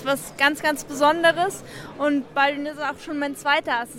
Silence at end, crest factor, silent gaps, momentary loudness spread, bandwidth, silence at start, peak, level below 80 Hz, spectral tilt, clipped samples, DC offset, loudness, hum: 0 s; 18 dB; none; 9 LU; 16.5 kHz; 0 s; -6 dBFS; -58 dBFS; -3 dB/octave; under 0.1%; under 0.1%; -22 LUFS; none